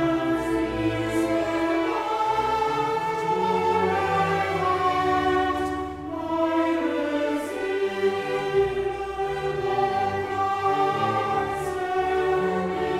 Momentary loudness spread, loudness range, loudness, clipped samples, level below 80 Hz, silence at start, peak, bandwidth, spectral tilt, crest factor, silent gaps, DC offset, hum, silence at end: 5 LU; 2 LU; -24 LUFS; under 0.1%; -48 dBFS; 0 s; -12 dBFS; 15 kHz; -6 dB/octave; 14 dB; none; under 0.1%; none; 0 s